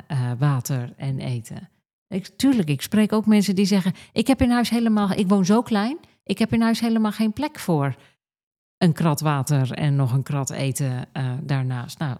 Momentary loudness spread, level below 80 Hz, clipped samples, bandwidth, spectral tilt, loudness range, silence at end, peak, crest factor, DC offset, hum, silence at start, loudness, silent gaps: 10 LU; -52 dBFS; under 0.1%; 15 kHz; -6.5 dB/octave; 4 LU; 0 s; -6 dBFS; 16 dB; under 0.1%; none; 0.1 s; -22 LUFS; 1.93-2.06 s, 8.43-8.81 s